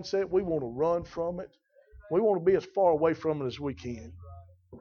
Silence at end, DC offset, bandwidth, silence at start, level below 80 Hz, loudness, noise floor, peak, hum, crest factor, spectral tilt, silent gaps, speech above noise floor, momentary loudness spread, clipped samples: 0 s; under 0.1%; 6.8 kHz; 0 s; -56 dBFS; -29 LUFS; -54 dBFS; -12 dBFS; none; 16 dB; -7 dB/octave; none; 26 dB; 17 LU; under 0.1%